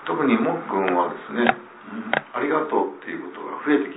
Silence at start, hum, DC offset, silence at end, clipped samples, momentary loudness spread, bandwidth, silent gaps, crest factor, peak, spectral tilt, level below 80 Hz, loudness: 0 s; none; under 0.1%; 0 s; under 0.1%; 12 LU; 4 kHz; none; 22 dB; 0 dBFS; -9.5 dB/octave; -68 dBFS; -23 LUFS